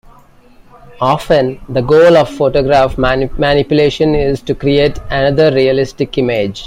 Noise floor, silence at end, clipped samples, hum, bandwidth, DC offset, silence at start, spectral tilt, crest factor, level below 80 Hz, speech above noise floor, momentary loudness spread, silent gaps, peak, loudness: -42 dBFS; 0 s; under 0.1%; none; 15 kHz; under 0.1%; 0.9 s; -6.5 dB/octave; 12 dB; -30 dBFS; 31 dB; 7 LU; none; 0 dBFS; -12 LUFS